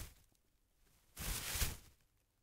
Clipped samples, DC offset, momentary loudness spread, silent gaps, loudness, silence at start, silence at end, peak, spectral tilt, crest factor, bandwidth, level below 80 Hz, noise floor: under 0.1%; under 0.1%; 17 LU; none; -42 LUFS; 0 s; 0.55 s; -22 dBFS; -2 dB/octave; 24 dB; 16 kHz; -52 dBFS; -76 dBFS